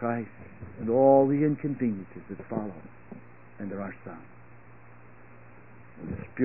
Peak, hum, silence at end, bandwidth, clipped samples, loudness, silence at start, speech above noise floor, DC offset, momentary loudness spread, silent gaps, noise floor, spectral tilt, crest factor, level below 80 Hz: -8 dBFS; none; 0 s; 2.9 kHz; under 0.1%; -27 LUFS; 0 s; 25 dB; 0.3%; 27 LU; none; -52 dBFS; -13.5 dB/octave; 22 dB; -60 dBFS